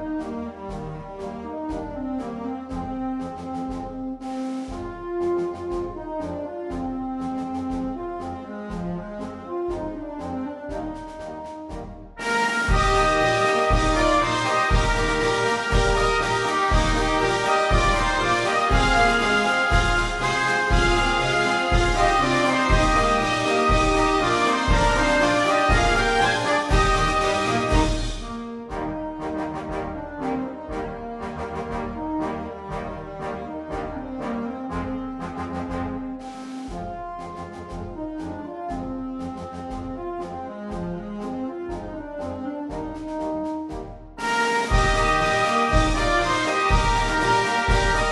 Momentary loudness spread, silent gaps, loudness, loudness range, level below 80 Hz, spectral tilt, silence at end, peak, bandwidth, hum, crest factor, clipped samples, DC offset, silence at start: 14 LU; none; -23 LUFS; 12 LU; -30 dBFS; -4.5 dB/octave; 0 s; -4 dBFS; 11.5 kHz; none; 18 dB; under 0.1%; under 0.1%; 0 s